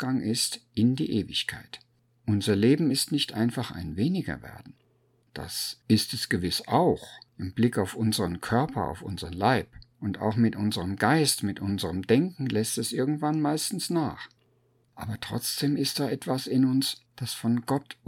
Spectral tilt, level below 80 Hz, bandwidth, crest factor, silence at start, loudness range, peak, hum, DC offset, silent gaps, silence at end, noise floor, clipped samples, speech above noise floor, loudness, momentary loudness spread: -5 dB/octave; -56 dBFS; 18 kHz; 20 dB; 0 s; 3 LU; -6 dBFS; none; under 0.1%; none; 0.15 s; -67 dBFS; under 0.1%; 40 dB; -27 LUFS; 12 LU